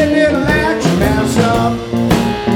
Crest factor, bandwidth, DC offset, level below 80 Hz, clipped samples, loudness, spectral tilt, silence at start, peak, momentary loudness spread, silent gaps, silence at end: 12 dB; 18 kHz; under 0.1%; -28 dBFS; under 0.1%; -13 LUFS; -6 dB/octave; 0 s; 0 dBFS; 3 LU; none; 0 s